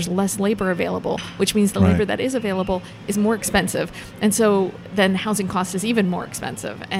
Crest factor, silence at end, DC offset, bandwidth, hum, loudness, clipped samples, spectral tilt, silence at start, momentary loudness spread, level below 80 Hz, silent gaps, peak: 18 dB; 0 s; under 0.1%; 16 kHz; none; -21 LUFS; under 0.1%; -5 dB/octave; 0 s; 9 LU; -46 dBFS; none; -4 dBFS